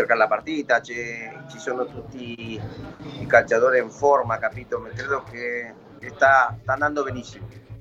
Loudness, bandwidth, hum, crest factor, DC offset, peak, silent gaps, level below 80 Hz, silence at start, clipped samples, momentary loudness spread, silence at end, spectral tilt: -22 LUFS; 8 kHz; none; 22 dB; under 0.1%; -2 dBFS; none; -54 dBFS; 0 s; under 0.1%; 19 LU; 0 s; -5 dB/octave